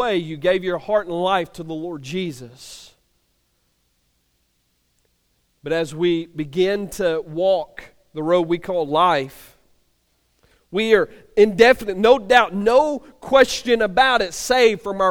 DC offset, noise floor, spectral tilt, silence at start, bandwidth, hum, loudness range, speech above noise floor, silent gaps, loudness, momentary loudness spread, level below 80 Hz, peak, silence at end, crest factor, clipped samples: under 0.1%; -67 dBFS; -4.5 dB/octave; 0 s; 18 kHz; none; 14 LU; 48 dB; none; -19 LUFS; 15 LU; -50 dBFS; 0 dBFS; 0 s; 20 dB; under 0.1%